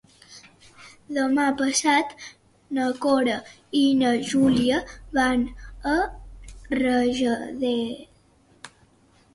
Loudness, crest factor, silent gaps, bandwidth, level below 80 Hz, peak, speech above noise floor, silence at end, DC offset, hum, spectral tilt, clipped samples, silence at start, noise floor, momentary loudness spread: -23 LUFS; 16 dB; none; 11.5 kHz; -48 dBFS; -8 dBFS; 36 dB; 0.7 s; under 0.1%; none; -3.5 dB/octave; under 0.1%; 0.3 s; -58 dBFS; 12 LU